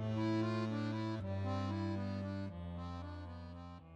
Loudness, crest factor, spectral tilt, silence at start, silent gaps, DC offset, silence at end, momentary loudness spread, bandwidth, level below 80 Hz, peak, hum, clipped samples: -41 LUFS; 12 dB; -8 dB/octave; 0 s; none; under 0.1%; 0 s; 13 LU; 8.4 kHz; -62 dBFS; -28 dBFS; none; under 0.1%